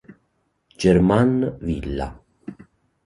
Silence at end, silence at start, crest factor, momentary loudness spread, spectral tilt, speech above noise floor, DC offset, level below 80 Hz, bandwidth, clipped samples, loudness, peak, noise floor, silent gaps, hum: 0.55 s; 0.1 s; 20 dB; 24 LU; -7.5 dB/octave; 50 dB; under 0.1%; -38 dBFS; 11.5 kHz; under 0.1%; -20 LUFS; -2 dBFS; -69 dBFS; none; none